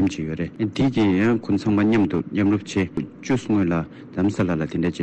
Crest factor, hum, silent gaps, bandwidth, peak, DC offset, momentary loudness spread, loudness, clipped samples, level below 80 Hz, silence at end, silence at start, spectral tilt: 8 dB; none; none; 8.8 kHz; -12 dBFS; under 0.1%; 8 LU; -22 LUFS; under 0.1%; -50 dBFS; 0 s; 0 s; -7 dB/octave